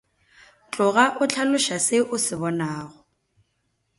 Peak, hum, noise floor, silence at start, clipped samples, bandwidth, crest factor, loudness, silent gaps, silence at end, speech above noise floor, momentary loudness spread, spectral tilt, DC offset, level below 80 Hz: 0 dBFS; none; -72 dBFS; 0.7 s; under 0.1%; 11.5 kHz; 24 dB; -22 LUFS; none; 1.1 s; 50 dB; 14 LU; -3 dB/octave; under 0.1%; -66 dBFS